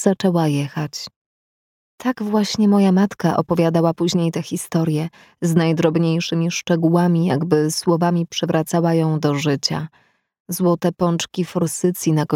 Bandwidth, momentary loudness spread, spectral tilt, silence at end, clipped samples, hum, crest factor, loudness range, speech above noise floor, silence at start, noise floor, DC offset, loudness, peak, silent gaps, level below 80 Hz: 16 kHz; 9 LU; -6 dB/octave; 0 s; under 0.1%; none; 16 dB; 2 LU; over 72 dB; 0 s; under -90 dBFS; under 0.1%; -19 LUFS; -2 dBFS; 1.16-1.98 s, 10.40-10.45 s; -60 dBFS